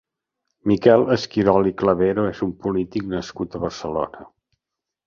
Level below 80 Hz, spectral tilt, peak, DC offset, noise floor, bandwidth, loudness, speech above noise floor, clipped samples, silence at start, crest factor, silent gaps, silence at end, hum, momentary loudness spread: -48 dBFS; -7 dB/octave; -2 dBFS; under 0.1%; -84 dBFS; 7.4 kHz; -21 LUFS; 64 dB; under 0.1%; 0.65 s; 20 dB; none; 0.85 s; none; 12 LU